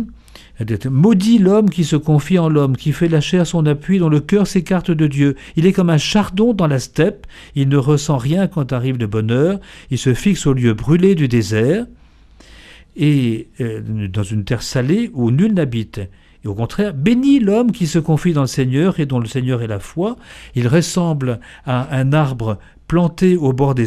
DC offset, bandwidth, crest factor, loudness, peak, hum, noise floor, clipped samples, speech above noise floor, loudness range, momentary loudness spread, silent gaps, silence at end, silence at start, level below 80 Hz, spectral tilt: under 0.1%; 13.5 kHz; 16 dB; -16 LUFS; 0 dBFS; none; -45 dBFS; under 0.1%; 30 dB; 4 LU; 10 LU; none; 0 s; 0 s; -40 dBFS; -7 dB/octave